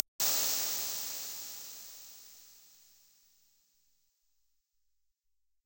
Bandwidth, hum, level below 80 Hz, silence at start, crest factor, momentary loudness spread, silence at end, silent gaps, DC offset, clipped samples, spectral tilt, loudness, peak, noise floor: 16 kHz; none; -84 dBFS; 0.2 s; 34 dB; 24 LU; 3 s; none; under 0.1%; under 0.1%; 1.5 dB/octave; -32 LUFS; -6 dBFS; -81 dBFS